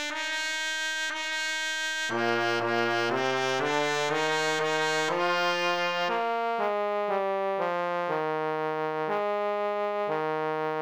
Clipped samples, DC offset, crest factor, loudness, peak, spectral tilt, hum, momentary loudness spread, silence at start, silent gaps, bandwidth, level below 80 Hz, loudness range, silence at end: under 0.1%; under 0.1%; 16 dB; -28 LUFS; -12 dBFS; -3 dB/octave; none; 3 LU; 0 s; none; over 20 kHz; -78 dBFS; 3 LU; 0 s